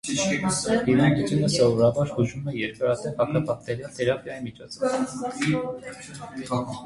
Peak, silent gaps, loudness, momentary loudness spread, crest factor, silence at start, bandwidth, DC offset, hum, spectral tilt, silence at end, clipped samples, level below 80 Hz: -8 dBFS; none; -24 LUFS; 16 LU; 18 dB; 0.05 s; 11.5 kHz; under 0.1%; none; -5.5 dB/octave; 0 s; under 0.1%; -54 dBFS